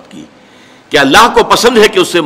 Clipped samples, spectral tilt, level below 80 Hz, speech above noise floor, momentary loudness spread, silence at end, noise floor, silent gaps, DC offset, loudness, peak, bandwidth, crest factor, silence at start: 0.6%; -3 dB/octave; -38 dBFS; 32 dB; 5 LU; 0 s; -39 dBFS; none; under 0.1%; -7 LUFS; 0 dBFS; 16.5 kHz; 10 dB; 0.15 s